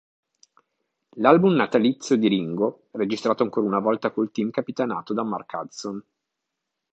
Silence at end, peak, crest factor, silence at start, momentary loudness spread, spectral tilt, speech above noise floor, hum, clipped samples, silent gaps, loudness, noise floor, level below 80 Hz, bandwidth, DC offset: 0.95 s; -2 dBFS; 22 dB; 1.15 s; 14 LU; -6.5 dB/octave; 60 dB; none; under 0.1%; none; -23 LUFS; -82 dBFS; -70 dBFS; 8.2 kHz; under 0.1%